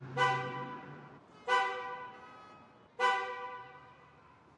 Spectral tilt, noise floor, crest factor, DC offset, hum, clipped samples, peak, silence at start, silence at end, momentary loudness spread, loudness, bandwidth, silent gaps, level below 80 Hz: -4 dB/octave; -61 dBFS; 20 dB; under 0.1%; none; under 0.1%; -18 dBFS; 0 s; 0.5 s; 23 LU; -34 LUFS; 11.5 kHz; none; -80 dBFS